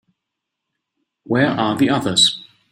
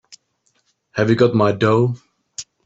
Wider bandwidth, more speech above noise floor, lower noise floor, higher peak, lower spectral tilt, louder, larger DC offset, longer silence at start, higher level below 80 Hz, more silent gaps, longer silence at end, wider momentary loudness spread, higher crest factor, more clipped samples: first, 16 kHz vs 8 kHz; first, 63 dB vs 50 dB; first, -80 dBFS vs -66 dBFS; about the same, 0 dBFS vs -2 dBFS; second, -3.5 dB/octave vs -6.5 dB/octave; about the same, -16 LUFS vs -17 LUFS; neither; first, 1.3 s vs 0.1 s; about the same, -58 dBFS vs -58 dBFS; neither; about the same, 0.3 s vs 0.25 s; second, 7 LU vs 19 LU; about the same, 20 dB vs 16 dB; neither